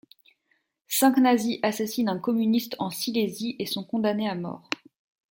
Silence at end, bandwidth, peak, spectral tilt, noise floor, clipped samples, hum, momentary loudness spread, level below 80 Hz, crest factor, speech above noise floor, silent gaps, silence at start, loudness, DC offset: 0.55 s; 17 kHz; -8 dBFS; -4 dB/octave; -72 dBFS; under 0.1%; none; 11 LU; -72 dBFS; 20 dB; 47 dB; none; 0.9 s; -26 LUFS; under 0.1%